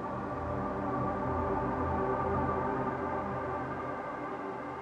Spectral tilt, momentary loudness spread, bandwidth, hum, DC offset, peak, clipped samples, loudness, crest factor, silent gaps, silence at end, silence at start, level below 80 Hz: -9 dB/octave; 7 LU; 9.4 kHz; none; under 0.1%; -18 dBFS; under 0.1%; -34 LUFS; 14 dB; none; 0 s; 0 s; -50 dBFS